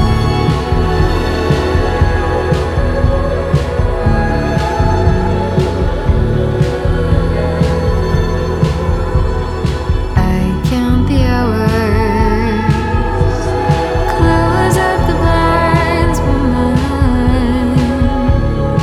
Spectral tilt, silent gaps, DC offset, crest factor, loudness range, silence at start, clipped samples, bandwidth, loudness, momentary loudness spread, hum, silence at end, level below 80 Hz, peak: -7 dB/octave; none; under 0.1%; 12 dB; 2 LU; 0 s; under 0.1%; 13.5 kHz; -14 LUFS; 4 LU; none; 0 s; -18 dBFS; 0 dBFS